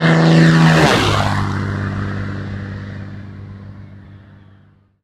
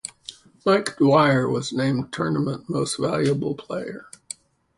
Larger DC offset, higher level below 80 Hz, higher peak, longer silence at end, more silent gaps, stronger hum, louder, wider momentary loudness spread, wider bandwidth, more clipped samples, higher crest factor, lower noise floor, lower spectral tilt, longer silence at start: neither; first, -38 dBFS vs -60 dBFS; first, 0 dBFS vs -4 dBFS; about the same, 0.85 s vs 0.75 s; neither; first, 50 Hz at -35 dBFS vs none; first, -14 LUFS vs -22 LUFS; first, 24 LU vs 20 LU; about the same, 12 kHz vs 11.5 kHz; neither; about the same, 16 dB vs 18 dB; first, -50 dBFS vs -45 dBFS; about the same, -6 dB/octave vs -5.5 dB/octave; about the same, 0 s vs 0.05 s